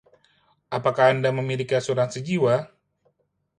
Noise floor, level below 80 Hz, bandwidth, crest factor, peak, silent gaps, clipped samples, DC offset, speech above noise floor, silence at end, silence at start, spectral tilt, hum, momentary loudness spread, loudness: -70 dBFS; -66 dBFS; 11 kHz; 20 dB; -6 dBFS; none; under 0.1%; under 0.1%; 48 dB; 0.95 s; 0.7 s; -6 dB/octave; none; 7 LU; -23 LUFS